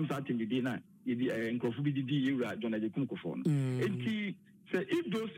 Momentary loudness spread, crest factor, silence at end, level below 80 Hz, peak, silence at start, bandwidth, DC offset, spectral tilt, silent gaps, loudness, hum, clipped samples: 6 LU; 14 dB; 0 s; -78 dBFS; -20 dBFS; 0 s; 16 kHz; under 0.1%; -7.5 dB/octave; none; -35 LUFS; none; under 0.1%